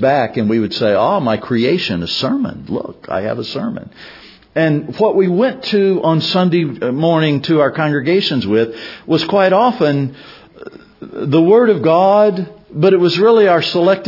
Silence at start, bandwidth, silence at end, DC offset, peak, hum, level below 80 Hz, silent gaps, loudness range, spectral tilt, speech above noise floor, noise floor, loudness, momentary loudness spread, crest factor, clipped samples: 0 s; 5.8 kHz; 0 s; under 0.1%; 0 dBFS; none; -56 dBFS; none; 6 LU; -7.5 dB/octave; 22 dB; -36 dBFS; -14 LUFS; 12 LU; 14 dB; under 0.1%